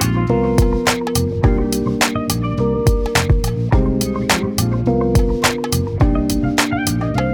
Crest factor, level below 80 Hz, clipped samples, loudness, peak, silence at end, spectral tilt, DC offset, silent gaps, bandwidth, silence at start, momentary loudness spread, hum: 14 dB; -22 dBFS; under 0.1%; -17 LUFS; -2 dBFS; 0 s; -5.5 dB/octave; under 0.1%; none; over 20 kHz; 0 s; 3 LU; none